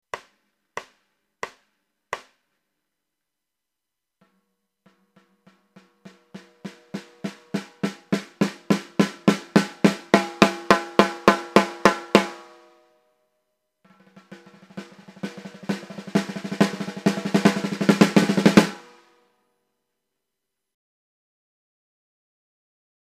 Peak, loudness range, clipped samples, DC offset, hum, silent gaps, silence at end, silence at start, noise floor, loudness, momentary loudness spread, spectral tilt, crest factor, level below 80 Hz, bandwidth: 0 dBFS; 22 LU; under 0.1%; under 0.1%; none; none; 4.35 s; 0.15 s; -85 dBFS; -21 LUFS; 21 LU; -5.5 dB/octave; 26 dB; -60 dBFS; 15 kHz